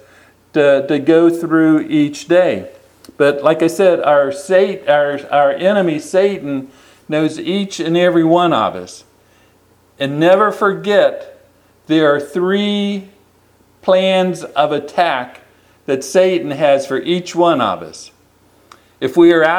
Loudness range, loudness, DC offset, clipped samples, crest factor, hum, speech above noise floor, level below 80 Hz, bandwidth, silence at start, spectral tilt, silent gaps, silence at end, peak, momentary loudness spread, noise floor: 3 LU; -14 LUFS; under 0.1%; under 0.1%; 14 dB; none; 38 dB; -62 dBFS; 14 kHz; 0.55 s; -5.5 dB/octave; none; 0 s; 0 dBFS; 11 LU; -52 dBFS